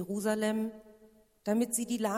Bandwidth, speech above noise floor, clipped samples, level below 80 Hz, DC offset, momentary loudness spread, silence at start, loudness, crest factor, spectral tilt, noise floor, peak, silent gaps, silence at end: 16 kHz; 30 dB; under 0.1%; -70 dBFS; under 0.1%; 8 LU; 0 s; -32 LUFS; 16 dB; -4.5 dB/octave; -62 dBFS; -16 dBFS; none; 0 s